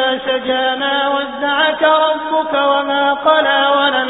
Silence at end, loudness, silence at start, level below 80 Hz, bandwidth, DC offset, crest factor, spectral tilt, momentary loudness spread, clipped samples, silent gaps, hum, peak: 0 s; -14 LUFS; 0 s; -54 dBFS; 4 kHz; under 0.1%; 14 dB; -6.5 dB/octave; 5 LU; under 0.1%; none; none; 0 dBFS